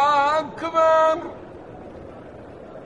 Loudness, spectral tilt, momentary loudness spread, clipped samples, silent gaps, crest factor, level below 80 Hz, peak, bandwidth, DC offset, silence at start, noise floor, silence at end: -19 LUFS; -4.5 dB/octave; 23 LU; under 0.1%; none; 16 dB; -56 dBFS; -6 dBFS; 9.8 kHz; 0.1%; 0 s; -40 dBFS; 0 s